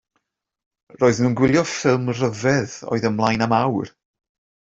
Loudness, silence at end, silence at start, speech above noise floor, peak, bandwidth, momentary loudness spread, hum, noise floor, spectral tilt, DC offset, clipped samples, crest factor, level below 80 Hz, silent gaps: -20 LUFS; 0.75 s; 1 s; 54 dB; -4 dBFS; 8 kHz; 6 LU; none; -73 dBFS; -6 dB/octave; under 0.1%; under 0.1%; 18 dB; -54 dBFS; none